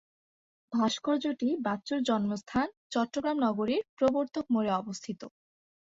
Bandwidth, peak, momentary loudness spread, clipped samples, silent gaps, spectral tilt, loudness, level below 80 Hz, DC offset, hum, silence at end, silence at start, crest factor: 8 kHz; -14 dBFS; 7 LU; under 0.1%; 2.77-2.90 s, 3.89-3.97 s; -5 dB/octave; -31 LUFS; -66 dBFS; under 0.1%; none; 0.7 s; 0.7 s; 16 dB